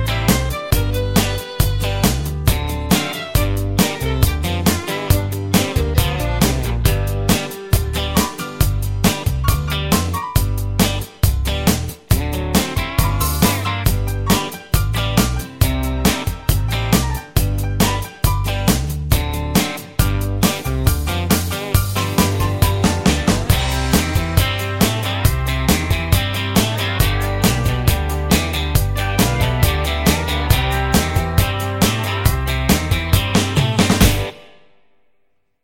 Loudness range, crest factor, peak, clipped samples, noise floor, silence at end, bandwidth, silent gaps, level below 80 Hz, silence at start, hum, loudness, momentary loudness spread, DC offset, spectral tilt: 2 LU; 18 dB; 0 dBFS; under 0.1%; -65 dBFS; 1.2 s; 17 kHz; none; -24 dBFS; 0 s; none; -18 LUFS; 3 LU; under 0.1%; -4.5 dB/octave